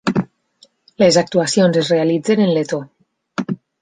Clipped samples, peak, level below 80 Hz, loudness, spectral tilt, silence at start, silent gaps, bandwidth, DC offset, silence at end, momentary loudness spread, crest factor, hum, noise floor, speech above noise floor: under 0.1%; -2 dBFS; -58 dBFS; -16 LUFS; -5 dB/octave; 0.05 s; none; 9.8 kHz; under 0.1%; 0.25 s; 13 LU; 16 dB; none; -54 dBFS; 39 dB